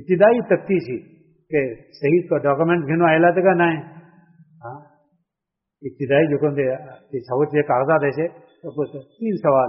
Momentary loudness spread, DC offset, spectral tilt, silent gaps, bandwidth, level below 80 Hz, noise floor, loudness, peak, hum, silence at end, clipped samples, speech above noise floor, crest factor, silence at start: 17 LU; under 0.1%; -6 dB/octave; none; 5.8 kHz; -62 dBFS; -83 dBFS; -19 LUFS; -4 dBFS; none; 0 s; under 0.1%; 64 dB; 16 dB; 0 s